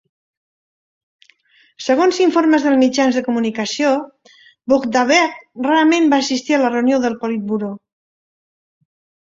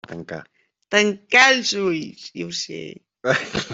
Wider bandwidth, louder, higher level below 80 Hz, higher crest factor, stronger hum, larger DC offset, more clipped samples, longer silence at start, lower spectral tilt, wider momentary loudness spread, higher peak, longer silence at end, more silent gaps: about the same, 7.8 kHz vs 8.2 kHz; first, -16 LUFS vs -19 LUFS; about the same, -62 dBFS vs -60 dBFS; about the same, 16 dB vs 20 dB; neither; neither; neither; first, 1.8 s vs 0.1 s; first, -4 dB/octave vs -2.5 dB/octave; second, 10 LU vs 21 LU; about the same, 0 dBFS vs -2 dBFS; first, 1.5 s vs 0 s; neither